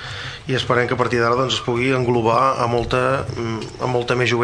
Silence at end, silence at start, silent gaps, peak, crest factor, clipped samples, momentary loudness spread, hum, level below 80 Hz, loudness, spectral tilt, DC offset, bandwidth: 0 s; 0 s; none; -2 dBFS; 16 dB; under 0.1%; 8 LU; none; -42 dBFS; -19 LUFS; -5.5 dB/octave; under 0.1%; 10.5 kHz